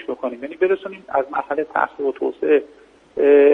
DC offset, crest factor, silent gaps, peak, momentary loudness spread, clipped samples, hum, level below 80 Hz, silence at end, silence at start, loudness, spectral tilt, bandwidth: under 0.1%; 16 dB; none; -2 dBFS; 11 LU; under 0.1%; none; -64 dBFS; 0 s; 0 s; -20 LUFS; -7 dB/octave; 3.9 kHz